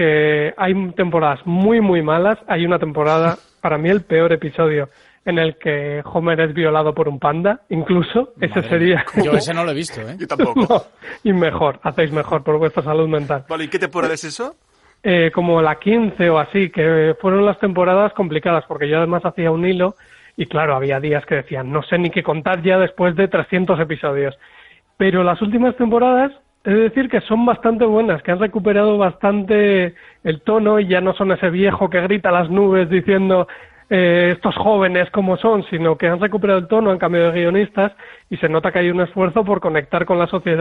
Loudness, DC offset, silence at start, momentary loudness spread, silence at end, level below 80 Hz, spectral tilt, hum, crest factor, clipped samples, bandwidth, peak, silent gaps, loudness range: -17 LUFS; under 0.1%; 0 s; 7 LU; 0 s; -50 dBFS; -7 dB/octave; none; 16 dB; under 0.1%; 11.5 kHz; -2 dBFS; none; 3 LU